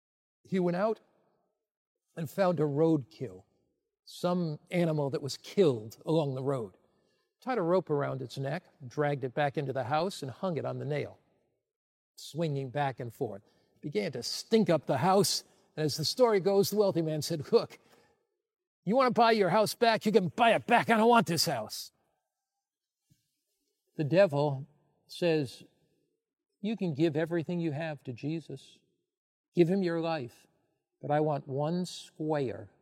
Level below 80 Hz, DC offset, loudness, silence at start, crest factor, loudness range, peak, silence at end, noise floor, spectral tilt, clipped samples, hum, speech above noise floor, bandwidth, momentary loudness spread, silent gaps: -78 dBFS; under 0.1%; -30 LUFS; 0.5 s; 20 dB; 8 LU; -10 dBFS; 0.15 s; under -90 dBFS; -5.5 dB/octave; under 0.1%; none; over 60 dB; 16 kHz; 16 LU; 1.71-1.95 s, 11.76-12.14 s, 18.67-18.83 s, 29.17-29.52 s